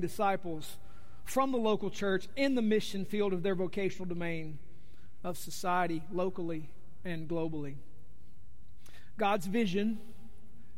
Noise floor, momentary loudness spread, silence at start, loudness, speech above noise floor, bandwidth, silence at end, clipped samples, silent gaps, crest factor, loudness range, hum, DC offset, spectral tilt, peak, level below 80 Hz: -58 dBFS; 16 LU; 0 s; -34 LUFS; 25 dB; 16 kHz; 0 s; under 0.1%; none; 16 dB; 6 LU; none; 2%; -5.5 dB/octave; -18 dBFS; -60 dBFS